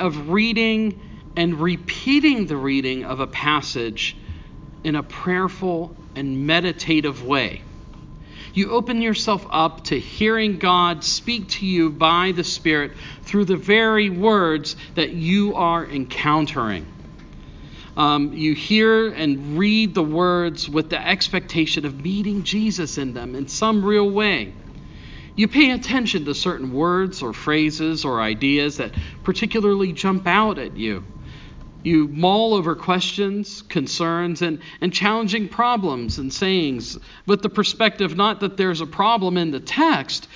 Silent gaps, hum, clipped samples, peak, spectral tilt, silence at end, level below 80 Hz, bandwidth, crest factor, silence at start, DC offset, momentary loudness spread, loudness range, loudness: none; none; under 0.1%; 0 dBFS; -5 dB/octave; 0 s; -44 dBFS; 7.6 kHz; 20 dB; 0 s; under 0.1%; 10 LU; 4 LU; -20 LUFS